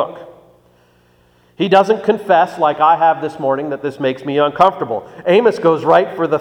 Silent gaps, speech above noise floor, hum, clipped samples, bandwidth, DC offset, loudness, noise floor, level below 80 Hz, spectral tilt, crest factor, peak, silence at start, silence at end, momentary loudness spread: none; 39 dB; 60 Hz at -50 dBFS; under 0.1%; 11.5 kHz; under 0.1%; -15 LUFS; -53 dBFS; -60 dBFS; -6.5 dB/octave; 16 dB; 0 dBFS; 0 s; 0 s; 10 LU